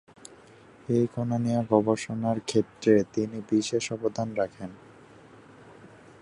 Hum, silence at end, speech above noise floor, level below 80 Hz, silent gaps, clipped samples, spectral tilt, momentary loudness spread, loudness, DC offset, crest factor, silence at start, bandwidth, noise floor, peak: none; 0.5 s; 26 dB; -64 dBFS; none; under 0.1%; -6 dB/octave; 9 LU; -27 LUFS; under 0.1%; 22 dB; 0.9 s; 11 kHz; -53 dBFS; -6 dBFS